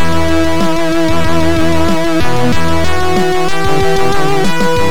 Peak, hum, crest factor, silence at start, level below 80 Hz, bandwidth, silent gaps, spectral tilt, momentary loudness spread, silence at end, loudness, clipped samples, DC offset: -2 dBFS; none; 12 dB; 0 s; -26 dBFS; 19 kHz; none; -5.5 dB/octave; 1 LU; 0 s; -13 LUFS; under 0.1%; 30%